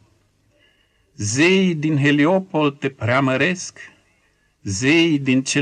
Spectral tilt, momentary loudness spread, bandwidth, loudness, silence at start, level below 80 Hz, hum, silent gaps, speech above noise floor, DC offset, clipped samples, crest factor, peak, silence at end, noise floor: -5 dB/octave; 12 LU; 10.5 kHz; -18 LUFS; 1.2 s; -62 dBFS; none; none; 44 dB; under 0.1%; under 0.1%; 14 dB; -6 dBFS; 0 s; -62 dBFS